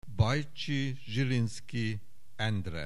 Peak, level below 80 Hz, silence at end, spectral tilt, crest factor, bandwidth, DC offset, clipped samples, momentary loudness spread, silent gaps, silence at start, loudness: -12 dBFS; -52 dBFS; 0 s; -6 dB/octave; 22 dB; 12 kHz; 1%; under 0.1%; 6 LU; none; 0.05 s; -33 LUFS